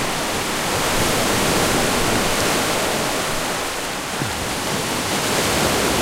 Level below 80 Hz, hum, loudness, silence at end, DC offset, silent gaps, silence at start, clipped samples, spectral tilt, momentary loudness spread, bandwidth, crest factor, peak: -36 dBFS; none; -19 LUFS; 0 s; under 0.1%; none; 0 s; under 0.1%; -2.5 dB/octave; 5 LU; 16 kHz; 16 dB; -4 dBFS